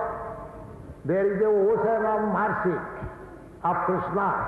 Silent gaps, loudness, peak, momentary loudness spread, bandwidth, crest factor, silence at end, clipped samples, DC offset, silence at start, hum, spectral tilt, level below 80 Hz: none; -25 LUFS; -14 dBFS; 19 LU; 4.2 kHz; 12 dB; 0 s; under 0.1%; under 0.1%; 0 s; none; -9.5 dB/octave; -50 dBFS